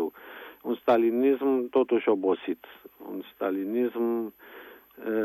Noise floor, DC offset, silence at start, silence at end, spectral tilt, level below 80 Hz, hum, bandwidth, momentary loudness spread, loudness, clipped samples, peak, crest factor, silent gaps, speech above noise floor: -46 dBFS; under 0.1%; 0 s; 0 s; -7.5 dB/octave; -78 dBFS; none; 12.5 kHz; 20 LU; -27 LUFS; under 0.1%; -10 dBFS; 18 dB; none; 20 dB